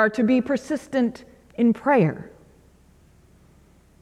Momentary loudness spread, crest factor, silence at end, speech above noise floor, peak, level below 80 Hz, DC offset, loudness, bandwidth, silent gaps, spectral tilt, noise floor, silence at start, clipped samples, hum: 18 LU; 16 dB; 1.75 s; 33 dB; -8 dBFS; -58 dBFS; under 0.1%; -22 LUFS; 11 kHz; none; -7.5 dB/octave; -55 dBFS; 0 s; under 0.1%; none